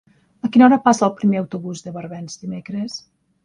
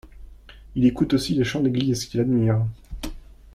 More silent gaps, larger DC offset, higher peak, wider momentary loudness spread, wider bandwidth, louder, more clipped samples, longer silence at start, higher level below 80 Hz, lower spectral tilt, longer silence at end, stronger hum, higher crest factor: neither; neither; first, 0 dBFS vs -8 dBFS; first, 19 LU vs 16 LU; second, 10.5 kHz vs 15 kHz; first, -17 LUFS vs -22 LUFS; neither; first, 0.45 s vs 0.05 s; second, -62 dBFS vs -42 dBFS; about the same, -6 dB/octave vs -6.5 dB/octave; about the same, 0.45 s vs 0.35 s; neither; about the same, 18 dB vs 16 dB